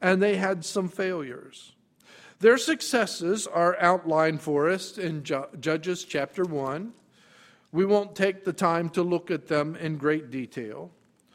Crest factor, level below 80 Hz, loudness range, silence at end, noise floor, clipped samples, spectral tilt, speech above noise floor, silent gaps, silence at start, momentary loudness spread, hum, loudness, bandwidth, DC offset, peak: 20 dB; -70 dBFS; 5 LU; 0.45 s; -57 dBFS; under 0.1%; -5 dB/octave; 31 dB; none; 0 s; 12 LU; none; -26 LUFS; 16 kHz; under 0.1%; -6 dBFS